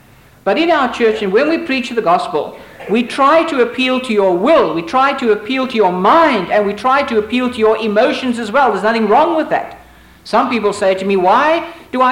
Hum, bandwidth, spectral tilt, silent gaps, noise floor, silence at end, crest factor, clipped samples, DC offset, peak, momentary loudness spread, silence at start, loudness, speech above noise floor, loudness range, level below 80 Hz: none; 16 kHz; -5 dB/octave; none; -41 dBFS; 0 s; 10 dB; under 0.1%; under 0.1%; -2 dBFS; 7 LU; 0.45 s; -14 LUFS; 28 dB; 2 LU; -50 dBFS